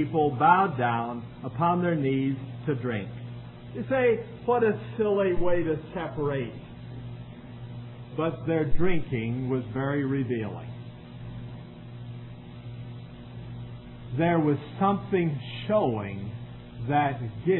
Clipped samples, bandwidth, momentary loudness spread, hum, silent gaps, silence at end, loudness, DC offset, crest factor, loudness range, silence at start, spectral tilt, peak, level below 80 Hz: under 0.1%; 4.2 kHz; 18 LU; 60 Hz at -45 dBFS; none; 0 s; -27 LUFS; under 0.1%; 20 dB; 7 LU; 0 s; -11.5 dB/octave; -6 dBFS; -46 dBFS